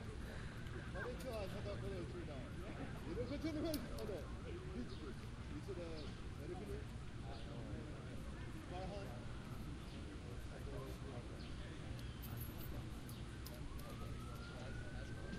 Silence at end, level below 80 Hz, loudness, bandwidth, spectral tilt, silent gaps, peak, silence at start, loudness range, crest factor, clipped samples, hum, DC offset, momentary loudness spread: 0 s; -54 dBFS; -49 LUFS; 15 kHz; -6 dB/octave; none; -28 dBFS; 0 s; 4 LU; 20 dB; under 0.1%; none; under 0.1%; 5 LU